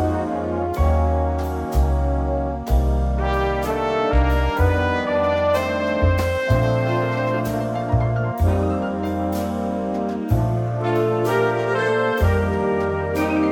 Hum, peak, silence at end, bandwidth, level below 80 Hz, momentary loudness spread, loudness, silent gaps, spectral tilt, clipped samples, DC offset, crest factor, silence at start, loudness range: none; -6 dBFS; 0 s; 19 kHz; -26 dBFS; 5 LU; -21 LUFS; none; -7.5 dB/octave; under 0.1%; under 0.1%; 14 dB; 0 s; 2 LU